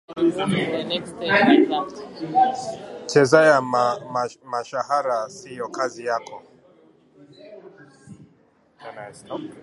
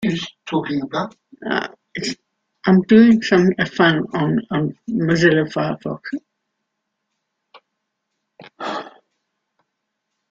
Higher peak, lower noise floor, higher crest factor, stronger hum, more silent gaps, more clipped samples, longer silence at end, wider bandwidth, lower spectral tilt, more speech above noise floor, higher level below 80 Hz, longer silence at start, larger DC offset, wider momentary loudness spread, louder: about the same, 0 dBFS vs -2 dBFS; second, -59 dBFS vs -77 dBFS; about the same, 22 dB vs 18 dB; neither; neither; neither; second, 0 s vs 1.45 s; first, 11.5 kHz vs 7.6 kHz; second, -5 dB/octave vs -6.5 dB/octave; second, 37 dB vs 59 dB; second, -66 dBFS vs -56 dBFS; about the same, 0.1 s vs 0 s; neither; about the same, 19 LU vs 17 LU; second, -21 LUFS vs -18 LUFS